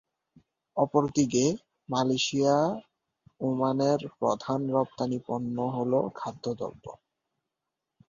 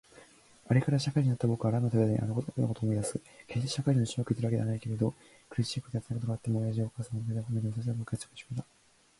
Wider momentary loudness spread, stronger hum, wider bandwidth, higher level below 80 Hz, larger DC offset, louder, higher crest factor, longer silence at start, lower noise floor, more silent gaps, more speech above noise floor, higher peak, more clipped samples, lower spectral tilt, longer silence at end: about the same, 12 LU vs 10 LU; neither; second, 7.6 kHz vs 11.5 kHz; second, -66 dBFS vs -60 dBFS; neither; first, -28 LUFS vs -32 LUFS; about the same, 20 dB vs 18 dB; first, 0.75 s vs 0.15 s; first, -86 dBFS vs -58 dBFS; neither; first, 59 dB vs 27 dB; first, -8 dBFS vs -12 dBFS; neither; second, -5.5 dB/octave vs -7 dB/octave; first, 1.15 s vs 0.55 s